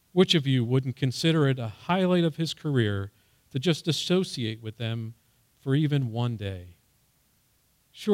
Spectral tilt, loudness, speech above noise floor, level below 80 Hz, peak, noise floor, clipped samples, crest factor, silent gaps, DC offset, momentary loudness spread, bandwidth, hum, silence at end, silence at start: -6 dB/octave; -27 LUFS; 41 dB; -66 dBFS; -10 dBFS; -67 dBFS; under 0.1%; 18 dB; none; under 0.1%; 13 LU; 15.5 kHz; none; 0 s; 0.15 s